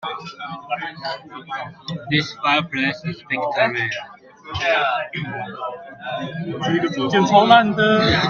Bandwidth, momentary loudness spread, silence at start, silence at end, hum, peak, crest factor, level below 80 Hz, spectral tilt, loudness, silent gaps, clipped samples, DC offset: 7.2 kHz; 17 LU; 0 s; 0 s; none; 0 dBFS; 20 dB; -52 dBFS; -5.5 dB/octave; -20 LUFS; none; under 0.1%; under 0.1%